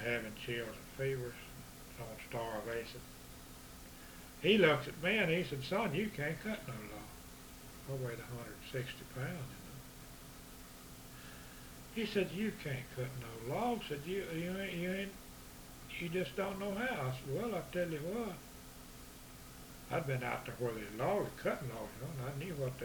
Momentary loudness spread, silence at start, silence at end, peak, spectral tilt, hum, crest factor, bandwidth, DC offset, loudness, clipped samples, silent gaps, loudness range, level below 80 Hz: 17 LU; 0 s; 0 s; -16 dBFS; -5 dB/octave; none; 24 dB; over 20 kHz; under 0.1%; -39 LUFS; under 0.1%; none; 11 LU; -60 dBFS